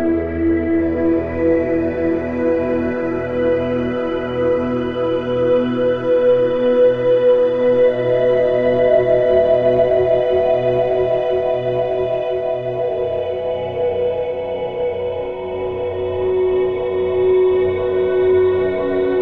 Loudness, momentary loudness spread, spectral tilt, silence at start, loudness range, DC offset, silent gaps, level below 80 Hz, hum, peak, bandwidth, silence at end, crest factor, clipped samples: -17 LUFS; 7 LU; -9 dB/octave; 0 s; 6 LU; 0.2%; none; -42 dBFS; none; -4 dBFS; 5 kHz; 0 s; 12 dB; under 0.1%